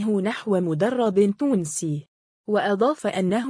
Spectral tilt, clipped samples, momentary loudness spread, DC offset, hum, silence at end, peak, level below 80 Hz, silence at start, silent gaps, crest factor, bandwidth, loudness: -6 dB/octave; under 0.1%; 7 LU; under 0.1%; none; 0 s; -8 dBFS; -66 dBFS; 0 s; 2.08-2.44 s; 14 dB; 10.5 kHz; -23 LUFS